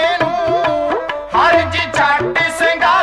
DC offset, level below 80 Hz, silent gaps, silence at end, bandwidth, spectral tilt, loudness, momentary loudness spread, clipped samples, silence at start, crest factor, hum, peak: under 0.1%; -44 dBFS; none; 0 s; 13 kHz; -4 dB/octave; -14 LUFS; 6 LU; under 0.1%; 0 s; 10 dB; none; -4 dBFS